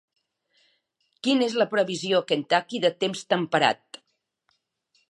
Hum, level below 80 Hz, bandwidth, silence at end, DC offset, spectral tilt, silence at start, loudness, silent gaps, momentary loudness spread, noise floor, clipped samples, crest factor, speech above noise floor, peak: none; -80 dBFS; 11.5 kHz; 1.35 s; under 0.1%; -4 dB/octave; 1.25 s; -24 LUFS; none; 5 LU; -74 dBFS; under 0.1%; 24 dB; 50 dB; -4 dBFS